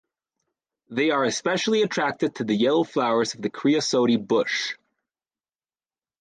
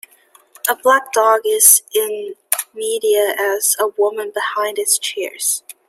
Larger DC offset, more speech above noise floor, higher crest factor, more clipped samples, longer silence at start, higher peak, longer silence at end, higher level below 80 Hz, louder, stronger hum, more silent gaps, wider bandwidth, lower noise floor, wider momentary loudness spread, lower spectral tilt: neither; first, over 67 dB vs 35 dB; about the same, 14 dB vs 18 dB; neither; first, 0.9 s vs 0.65 s; second, -10 dBFS vs 0 dBFS; first, 1.5 s vs 0.15 s; about the same, -72 dBFS vs -74 dBFS; second, -23 LUFS vs -15 LUFS; neither; neither; second, 9.8 kHz vs 16.5 kHz; first, under -90 dBFS vs -52 dBFS; second, 6 LU vs 12 LU; first, -4 dB/octave vs 1.5 dB/octave